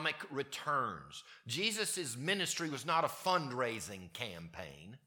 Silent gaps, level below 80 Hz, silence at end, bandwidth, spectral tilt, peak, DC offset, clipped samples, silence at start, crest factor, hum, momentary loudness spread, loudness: none; -74 dBFS; 0.1 s; 19 kHz; -2.5 dB/octave; -18 dBFS; under 0.1%; under 0.1%; 0 s; 20 dB; none; 14 LU; -36 LUFS